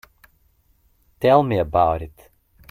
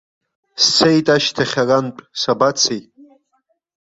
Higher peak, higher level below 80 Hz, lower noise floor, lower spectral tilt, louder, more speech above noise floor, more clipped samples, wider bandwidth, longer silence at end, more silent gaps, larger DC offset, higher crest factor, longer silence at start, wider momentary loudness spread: about the same, -2 dBFS vs 0 dBFS; first, -44 dBFS vs -58 dBFS; second, -61 dBFS vs -66 dBFS; first, -8 dB/octave vs -3.5 dB/octave; second, -19 LUFS vs -15 LUFS; second, 43 dB vs 50 dB; neither; first, 16 kHz vs 7.8 kHz; second, 0.6 s vs 1.05 s; neither; neither; about the same, 20 dB vs 18 dB; first, 1.2 s vs 0.55 s; about the same, 12 LU vs 12 LU